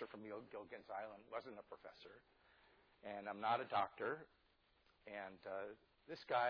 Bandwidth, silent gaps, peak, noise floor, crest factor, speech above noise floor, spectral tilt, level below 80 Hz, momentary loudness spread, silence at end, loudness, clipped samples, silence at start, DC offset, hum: 5.4 kHz; none; -26 dBFS; -77 dBFS; 20 dB; 31 dB; -2 dB/octave; -84 dBFS; 21 LU; 0 s; -47 LUFS; under 0.1%; 0 s; under 0.1%; none